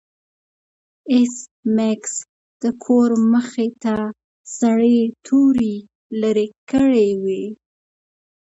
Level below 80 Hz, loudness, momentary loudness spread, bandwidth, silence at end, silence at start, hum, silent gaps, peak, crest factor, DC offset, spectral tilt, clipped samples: -56 dBFS; -18 LUFS; 13 LU; 8.2 kHz; 0.95 s; 1.05 s; none; 1.51-1.63 s, 2.29-2.60 s, 4.24-4.45 s, 5.95-6.10 s, 6.58-6.67 s; -4 dBFS; 14 dB; under 0.1%; -5.5 dB/octave; under 0.1%